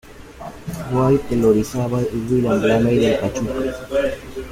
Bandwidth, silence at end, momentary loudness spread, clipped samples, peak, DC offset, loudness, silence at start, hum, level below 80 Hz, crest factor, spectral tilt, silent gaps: 16 kHz; 0 s; 15 LU; under 0.1%; -4 dBFS; under 0.1%; -19 LUFS; 0.05 s; none; -40 dBFS; 16 dB; -7 dB/octave; none